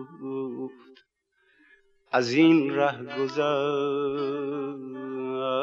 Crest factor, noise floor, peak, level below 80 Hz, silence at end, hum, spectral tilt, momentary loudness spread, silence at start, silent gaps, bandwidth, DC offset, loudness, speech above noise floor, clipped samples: 20 dB; -70 dBFS; -8 dBFS; -76 dBFS; 0 s; none; -6 dB/octave; 16 LU; 0 s; none; 7.4 kHz; under 0.1%; -26 LUFS; 44 dB; under 0.1%